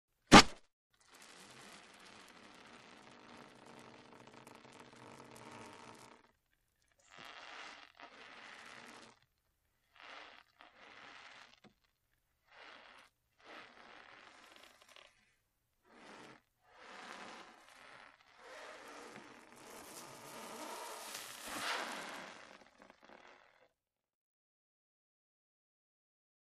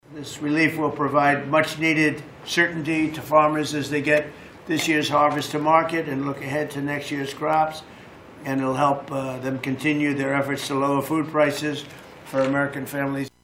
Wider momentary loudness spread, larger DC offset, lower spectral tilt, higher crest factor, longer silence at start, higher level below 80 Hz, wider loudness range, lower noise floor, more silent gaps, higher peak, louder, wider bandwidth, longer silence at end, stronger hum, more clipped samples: first, 16 LU vs 10 LU; neither; second, -3.5 dB/octave vs -5 dB/octave; first, 34 dB vs 20 dB; first, 0.3 s vs 0.1 s; about the same, -58 dBFS vs -60 dBFS; first, 13 LU vs 4 LU; first, -85 dBFS vs -43 dBFS; first, 0.73-0.90 s vs none; about the same, -6 dBFS vs -4 dBFS; second, -30 LUFS vs -23 LUFS; about the same, 15 kHz vs 16 kHz; first, 4.2 s vs 0.15 s; neither; neither